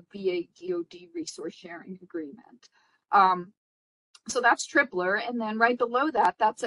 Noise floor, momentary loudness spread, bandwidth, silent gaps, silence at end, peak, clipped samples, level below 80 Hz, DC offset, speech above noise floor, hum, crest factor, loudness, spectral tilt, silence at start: under -90 dBFS; 19 LU; 11.5 kHz; 3.57-4.14 s; 0 s; -8 dBFS; under 0.1%; -76 dBFS; under 0.1%; over 63 dB; none; 20 dB; -26 LUFS; -3.5 dB/octave; 0.15 s